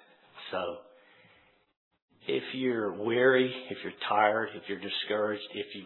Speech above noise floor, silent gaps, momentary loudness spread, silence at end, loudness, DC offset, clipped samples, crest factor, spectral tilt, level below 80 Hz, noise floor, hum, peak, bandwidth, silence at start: 34 dB; 1.77-1.91 s, 2.02-2.08 s; 14 LU; 0 s; -30 LUFS; under 0.1%; under 0.1%; 20 dB; -8 dB/octave; -82 dBFS; -64 dBFS; none; -10 dBFS; 4.3 kHz; 0.35 s